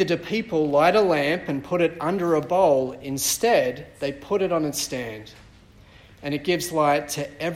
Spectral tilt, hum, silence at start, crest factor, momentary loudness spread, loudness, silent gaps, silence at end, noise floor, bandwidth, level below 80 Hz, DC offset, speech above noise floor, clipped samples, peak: -4 dB/octave; none; 0 s; 16 dB; 12 LU; -23 LUFS; none; 0 s; -50 dBFS; 16 kHz; -54 dBFS; under 0.1%; 27 dB; under 0.1%; -6 dBFS